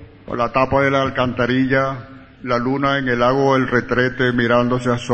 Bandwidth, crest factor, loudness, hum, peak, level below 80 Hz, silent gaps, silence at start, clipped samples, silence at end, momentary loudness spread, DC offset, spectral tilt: 8.6 kHz; 16 dB; -18 LUFS; none; -2 dBFS; -42 dBFS; none; 0 s; under 0.1%; 0 s; 7 LU; under 0.1%; -6.5 dB/octave